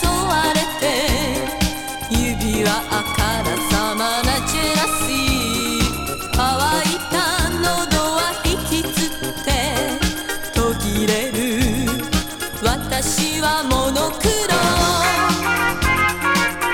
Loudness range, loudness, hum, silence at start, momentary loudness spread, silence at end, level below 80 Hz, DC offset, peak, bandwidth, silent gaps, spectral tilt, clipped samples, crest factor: 3 LU; -18 LUFS; none; 0 s; 5 LU; 0 s; -30 dBFS; under 0.1%; -2 dBFS; 19 kHz; none; -3.5 dB/octave; under 0.1%; 16 dB